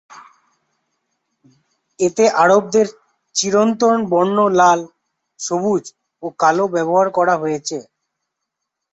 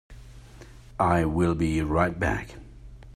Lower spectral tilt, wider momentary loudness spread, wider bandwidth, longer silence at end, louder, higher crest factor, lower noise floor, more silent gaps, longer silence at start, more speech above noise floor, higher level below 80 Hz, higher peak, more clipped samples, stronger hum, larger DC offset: second, -4 dB/octave vs -7.5 dB/octave; second, 12 LU vs 20 LU; second, 8.2 kHz vs 13.5 kHz; first, 1.1 s vs 0 s; first, -16 LUFS vs -25 LUFS; about the same, 16 dB vs 20 dB; first, -79 dBFS vs -47 dBFS; neither; about the same, 0.15 s vs 0.1 s; first, 63 dB vs 23 dB; second, -64 dBFS vs -42 dBFS; first, -2 dBFS vs -8 dBFS; neither; neither; neither